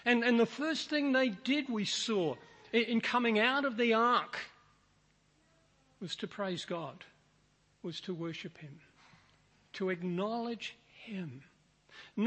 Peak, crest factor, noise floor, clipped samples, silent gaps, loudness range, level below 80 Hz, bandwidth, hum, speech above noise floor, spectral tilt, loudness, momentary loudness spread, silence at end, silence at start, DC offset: -14 dBFS; 20 dB; -70 dBFS; under 0.1%; none; 13 LU; -78 dBFS; 8.4 kHz; none; 37 dB; -4.5 dB/octave; -33 LUFS; 19 LU; 0 s; 0.05 s; under 0.1%